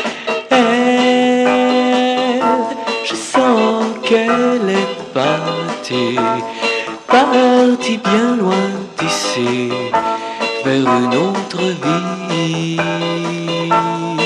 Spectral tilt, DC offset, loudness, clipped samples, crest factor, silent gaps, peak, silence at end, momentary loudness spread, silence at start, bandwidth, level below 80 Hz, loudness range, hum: -4.5 dB/octave; under 0.1%; -15 LUFS; under 0.1%; 14 dB; none; 0 dBFS; 0 s; 7 LU; 0 s; 11.5 kHz; -60 dBFS; 3 LU; none